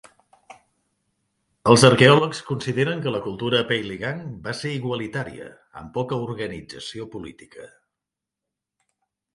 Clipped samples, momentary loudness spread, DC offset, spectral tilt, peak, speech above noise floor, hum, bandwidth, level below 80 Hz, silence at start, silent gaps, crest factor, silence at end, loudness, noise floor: under 0.1%; 21 LU; under 0.1%; -5 dB/octave; 0 dBFS; 64 dB; none; 11.5 kHz; -56 dBFS; 1.65 s; none; 24 dB; 1.7 s; -21 LUFS; -86 dBFS